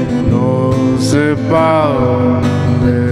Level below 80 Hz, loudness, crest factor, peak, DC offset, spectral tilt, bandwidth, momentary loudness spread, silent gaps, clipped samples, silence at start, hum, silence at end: -32 dBFS; -12 LUFS; 12 dB; 0 dBFS; under 0.1%; -7.5 dB/octave; 12 kHz; 2 LU; none; under 0.1%; 0 s; none; 0 s